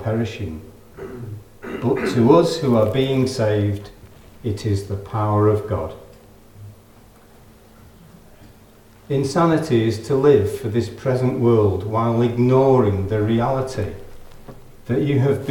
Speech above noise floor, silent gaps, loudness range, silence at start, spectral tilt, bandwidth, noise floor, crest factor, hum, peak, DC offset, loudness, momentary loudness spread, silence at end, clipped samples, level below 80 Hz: 29 dB; none; 7 LU; 0 s; -7.5 dB/octave; 17.5 kHz; -48 dBFS; 20 dB; none; 0 dBFS; under 0.1%; -19 LUFS; 17 LU; 0 s; under 0.1%; -48 dBFS